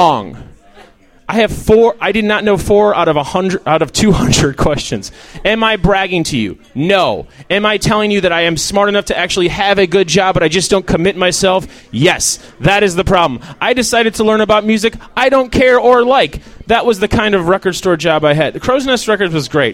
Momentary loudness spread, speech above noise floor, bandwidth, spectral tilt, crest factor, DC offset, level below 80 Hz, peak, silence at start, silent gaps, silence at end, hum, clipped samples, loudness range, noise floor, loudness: 7 LU; 30 dB; 16.5 kHz; -4 dB/octave; 12 dB; under 0.1%; -32 dBFS; 0 dBFS; 0 s; none; 0 s; none; under 0.1%; 2 LU; -42 dBFS; -12 LUFS